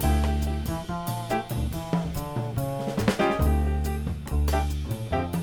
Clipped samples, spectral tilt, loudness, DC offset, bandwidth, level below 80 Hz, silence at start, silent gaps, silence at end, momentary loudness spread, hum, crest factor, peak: under 0.1%; -6.5 dB/octave; -28 LUFS; 0.2%; 19 kHz; -30 dBFS; 0 s; none; 0 s; 7 LU; none; 20 dB; -6 dBFS